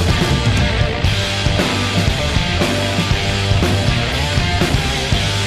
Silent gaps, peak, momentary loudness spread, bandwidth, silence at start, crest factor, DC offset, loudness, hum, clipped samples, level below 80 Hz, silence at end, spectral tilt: none; -4 dBFS; 2 LU; 15 kHz; 0 s; 12 dB; under 0.1%; -16 LUFS; none; under 0.1%; -24 dBFS; 0 s; -4.5 dB/octave